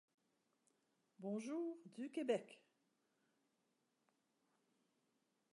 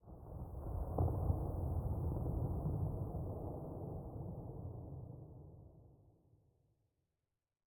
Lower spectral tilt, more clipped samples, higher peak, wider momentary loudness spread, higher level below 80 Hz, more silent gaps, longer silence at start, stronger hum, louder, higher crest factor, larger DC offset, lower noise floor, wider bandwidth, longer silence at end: second, -6 dB/octave vs -12 dB/octave; neither; second, -28 dBFS vs -24 dBFS; second, 11 LU vs 15 LU; second, under -90 dBFS vs -50 dBFS; neither; first, 1.2 s vs 0.05 s; neither; second, -46 LUFS vs -43 LUFS; about the same, 24 dB vs 20 dB; neither; second, -86 dBFS vs under -90 dBFS; second, 11 kHz vs 17 kHz; first, 2.95 s vs 1.65 s